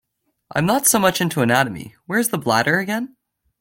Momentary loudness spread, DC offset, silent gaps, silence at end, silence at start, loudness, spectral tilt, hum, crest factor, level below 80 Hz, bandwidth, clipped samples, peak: 11 LU; under 0.1%; none; 0.55 s; 0.55 s; -19 LUFS; -3.5 dB/octave; none; 18 dB; -56 dBFS; 17 kHz; under 0.1%; -2 dBFS